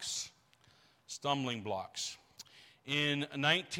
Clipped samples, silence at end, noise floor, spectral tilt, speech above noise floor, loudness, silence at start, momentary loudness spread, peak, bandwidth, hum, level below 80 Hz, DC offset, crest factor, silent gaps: under 0.1%; 0 s; -67 dBFS; -3 dB/octave; 32 dB; -35 LUFS; 0 s; 22 LU; -16 dBFS; 16.5 kHz; none; -78 dBFS; under 0.1%; 22 dB; none